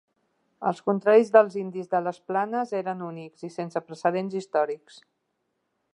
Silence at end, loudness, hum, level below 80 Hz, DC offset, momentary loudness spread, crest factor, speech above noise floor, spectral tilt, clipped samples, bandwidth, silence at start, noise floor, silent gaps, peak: 1.2 s; -25 LUFS; none; -84 dBFS; under 0.1%; 15 LU; 22 dB; 52 dB; -7 dB/octave; under 0.1%; 10.5 kHz; 0.6 s; -77 dBFS; none; -4 dBFS